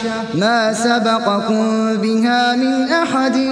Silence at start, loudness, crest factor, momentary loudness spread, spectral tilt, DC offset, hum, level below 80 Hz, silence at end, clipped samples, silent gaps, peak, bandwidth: 0 s; -16 LUFS; 16 dB; 2 LU; -4.5 dB/octave; under 0.1%; none; -60 dBFS; 0 s; under 0.1%; none; 0 dBFS; 11 kHz